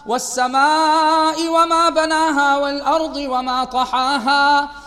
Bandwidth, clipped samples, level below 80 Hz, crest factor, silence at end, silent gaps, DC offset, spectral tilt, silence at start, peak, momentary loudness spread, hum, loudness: 15.5 kHz; under 0.1%; -50 dBFS; 12 dB; 0 s; none; under 0.1%; -1.5 dB/octave; 0.05 s; -4 dBFS; 6 LU; none; -16 LUFS